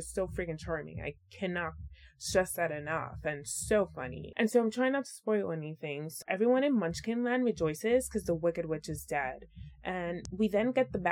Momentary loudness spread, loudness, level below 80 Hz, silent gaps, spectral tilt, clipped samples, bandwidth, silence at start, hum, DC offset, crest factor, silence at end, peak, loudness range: 11 LU; -33 LUFS; -54 dBFS; none; -5 dB/octave; under 0.1%; 17.5 kHz; 0 s; none; under 0.1%; 20 dB; 0 s; -12 dBFS; 3 LU